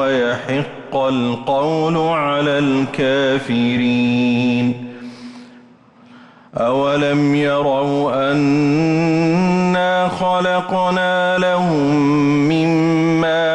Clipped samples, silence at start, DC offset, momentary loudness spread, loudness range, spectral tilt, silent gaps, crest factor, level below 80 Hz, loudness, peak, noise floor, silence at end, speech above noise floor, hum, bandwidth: under 0.1%; 0 s; under 0.1%; 5 LU; 4 LU; -6.5 dB/octave; none; 8 dB; -52 dBFS; -16 LUFS; -8 dBFS; -46 dBFS; 0 s; 30 dB; none; 9.8 kHz